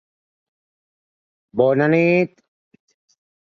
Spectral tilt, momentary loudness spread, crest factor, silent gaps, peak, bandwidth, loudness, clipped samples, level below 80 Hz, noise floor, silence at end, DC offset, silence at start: -8.5 dB/octave; 11 LU; 20 dB; none; -2 dBFS; 6.8 kHz; -18 LUFS; under 0.1%; -66 dBFS; under -90 dBFS; 1.35 s; under 0.1%; 1.55 s